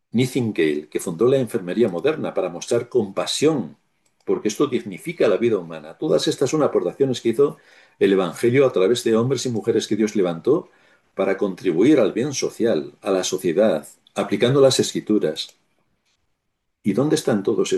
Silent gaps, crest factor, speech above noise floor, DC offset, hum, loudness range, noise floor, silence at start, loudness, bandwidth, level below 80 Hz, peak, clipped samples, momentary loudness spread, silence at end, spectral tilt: none; 18 dB; 55 dB; under 0.1%; none; 3 LU; -75 dBFS; 0.15 s; -21 LUFS; 12.5 kHz; -66 dBFS; -2 dBFS; under 0.1%; 9 LU; 0 s; -5 dB/octave